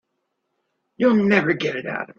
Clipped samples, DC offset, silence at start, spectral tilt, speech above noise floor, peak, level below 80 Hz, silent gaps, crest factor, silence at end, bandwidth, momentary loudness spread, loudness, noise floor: under 0.1%; under 0.1%; 1 s; -7 dB/octave; 56 dB; -4 dBFS; -64 dBFS; none; 20 dB; 0.15 s; 7 kHz; 8 LU; -20 LUFS; -75 dBFS